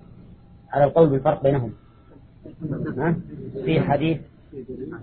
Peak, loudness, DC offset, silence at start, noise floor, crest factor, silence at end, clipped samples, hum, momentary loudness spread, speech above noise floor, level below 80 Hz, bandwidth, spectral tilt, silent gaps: -4 dBFS; -22 LUFS; under 0.1%; 0.1 s; -49 dBFS; 20 dB; 0 s; under 0.1%; none; 18 LU; 27 dB; -48 dBFS; 4.5 kHz; -12 dB/octave; none